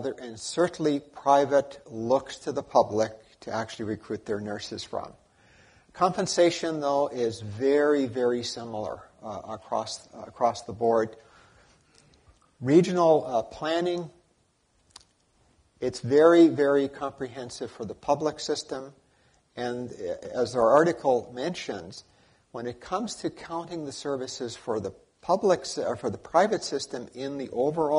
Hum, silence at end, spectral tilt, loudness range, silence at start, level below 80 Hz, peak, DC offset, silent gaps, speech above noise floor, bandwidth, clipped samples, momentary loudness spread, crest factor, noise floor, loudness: none; 0 s; -5 dB/octave; 8 LU; 0 s; -64 dBFS; -6 dBFS; under 0.1%; none; 42 dB; 11 kHz; under 0.1%; 16 LU; 22 dB; -68 dBFS; -27 LUFS